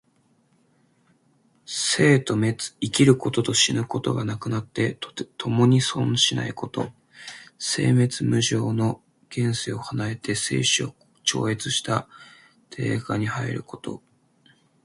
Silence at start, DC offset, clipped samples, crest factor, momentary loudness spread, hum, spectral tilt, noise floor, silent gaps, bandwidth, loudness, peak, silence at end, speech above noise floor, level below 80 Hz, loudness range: 1.7 s; under 0.1%; under 0.1%; 20 dB; 15 LU; none; -4.5 dB/octave; -64 dBFS; none; 11.5 kHz; -23 LUFS; -4 dBFS; 0.85 s; 41 dB; -58 dBFS; 4 LU